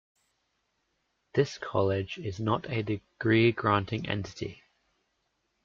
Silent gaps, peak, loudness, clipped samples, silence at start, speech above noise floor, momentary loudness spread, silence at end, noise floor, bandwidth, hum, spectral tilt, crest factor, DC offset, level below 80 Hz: none; -12 dBFS; -29 LUFS; under 0.1%; 1.35 s; 49 dB; 12 LU; 1.1 s; -77 dBFS; 7.4 kHz; none; -7 dB/octave; 20 dB; under 0.1%; -62 dBFS